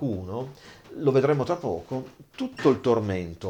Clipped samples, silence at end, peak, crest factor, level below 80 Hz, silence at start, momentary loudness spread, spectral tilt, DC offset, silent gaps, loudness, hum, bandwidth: under 0.1%; 0 s; -8 dBFS; 18 dB; -58 dBFS; 0 s; 14 LU; -7.5 dB/octave; under 0.1%; none; -26 LUFS; none; 10 kHz